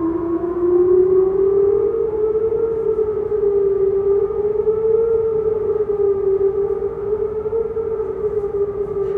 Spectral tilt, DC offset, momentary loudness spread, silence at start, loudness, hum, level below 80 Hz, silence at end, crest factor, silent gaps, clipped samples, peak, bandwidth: -11 dB/octave; under 0.1%; 7 LU; 0 s; -18 LUFS; none; -42 dBFS; 0 s; 12 dB; none; under 0.1%; -6 dBFS; 2.7 kHz